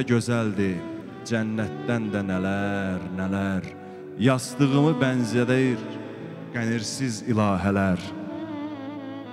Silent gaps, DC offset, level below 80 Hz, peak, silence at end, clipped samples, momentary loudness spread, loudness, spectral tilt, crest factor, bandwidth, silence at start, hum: none; under 0.1%; -60 dBFS; -6 dBFS; 0 s; under 0.1%; 14 LU; -25 LUFS; -6 dB/octave; 18 dB; 14 kHz; 0 s; none